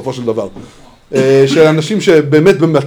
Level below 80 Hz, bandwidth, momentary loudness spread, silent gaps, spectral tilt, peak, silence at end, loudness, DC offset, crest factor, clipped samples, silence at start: -48 dBFS; 15 kHz; 10 LU; none; -6.5 dB/octave; 0 dBFS; 0 s; -10 LUFS; under 0.1%; 10 dB; 0.6%; 0 s